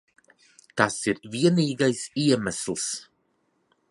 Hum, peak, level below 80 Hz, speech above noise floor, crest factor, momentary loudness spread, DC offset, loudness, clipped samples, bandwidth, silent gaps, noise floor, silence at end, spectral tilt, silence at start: none; -2 dBFS; -62 dBFS; 46 dB; 24 dB; 8 LU; under 0.1%; -25 LUFS; under 0.1%; 11.5 kHz; none; -71 dBFS; 0.85 s; -4.5 dB/octave; 0.75 s